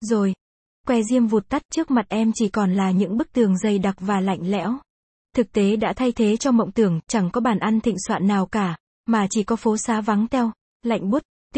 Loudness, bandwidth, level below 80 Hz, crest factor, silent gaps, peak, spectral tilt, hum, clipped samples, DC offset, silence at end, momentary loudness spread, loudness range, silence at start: -22 LUFS; 8.8 kHz; -52 dBFS; 16 dB; 0.41-0.84 s, 1.65-1.69 s, 4.90-5.25 s, 8.80-9.04 s, 10.61-10.80 s, 11.25-11.50 s; -6 dBFS; -6 dB/octave; none; under 0.1%; under 0.1%; 0 s; 6 LU; 2 LU; 0 s